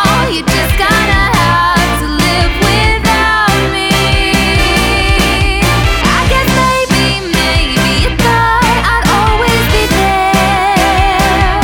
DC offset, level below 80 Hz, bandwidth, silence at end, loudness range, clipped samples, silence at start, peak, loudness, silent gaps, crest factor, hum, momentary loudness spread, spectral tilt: under 0.1%; -18 dBFS; over 20 kHz; 0 s; 0 LU; under 0.1%; 0 s; 0 dBFS; -10 LUFS; none; 10 dB; none; 2 LU; -4 dB/octave